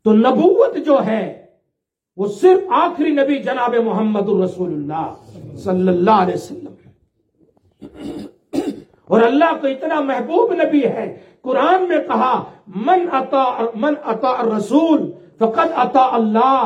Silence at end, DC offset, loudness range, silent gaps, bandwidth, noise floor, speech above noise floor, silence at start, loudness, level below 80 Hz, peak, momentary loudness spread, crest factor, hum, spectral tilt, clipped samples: 0 s; under 0.1%; 4 LU; none; 10.5 kHz; -76 dBFS; 61 dB; 0.05 s; -16 LUFS; -62 dBFS; -2 dBFS; 15 LU; 16 dB; none; -7 dB/octave; under 0.1%